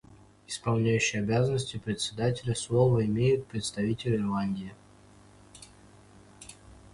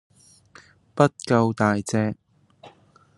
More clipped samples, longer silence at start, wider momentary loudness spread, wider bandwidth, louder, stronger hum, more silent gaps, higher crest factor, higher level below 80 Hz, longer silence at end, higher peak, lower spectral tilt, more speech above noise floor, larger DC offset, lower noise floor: neither; second, 0.5 s vs 0.95 s; first, 23 LU vs 14 LU; about the same, 11.5 kHz vs 12 kHz; second, -28 LUFS vs -22 LUFS; first, 50 Hz at -50 dBFS vs none; neither; second, 18 dB vs 24 dB; first, -56 dBFS vs -64 dBFS; second, 0.2 s vs 0.5 s; second, -12 dBFS vs -2 dBFS; about the same, -5.5 dB/octave vs -6.5 dB/octave; second, 28 dB vs 33 dB; neither; about the same, -55 dBFS vs -54 dBFS